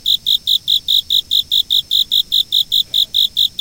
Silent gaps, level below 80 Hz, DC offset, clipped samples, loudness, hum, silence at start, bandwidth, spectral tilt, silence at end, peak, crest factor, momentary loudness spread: none; -48 dBFS; under 0.1%; under 0.1%; -12 LUFS; none; 0.05 s; 17.5 kHz; 1 dB/octave; 0.1 s; -2 dBFS; 14 dB; 1 LU